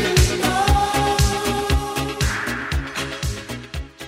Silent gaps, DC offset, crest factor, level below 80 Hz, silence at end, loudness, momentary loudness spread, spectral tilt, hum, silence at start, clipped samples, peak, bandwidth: none; under 0.1%; 16 dB; -26 dBFS; 0 s; -21 LUFS; 11 LU; -4 dB/octave; none; 0 s; under 0.1%; -4 dBFS; 16 kHz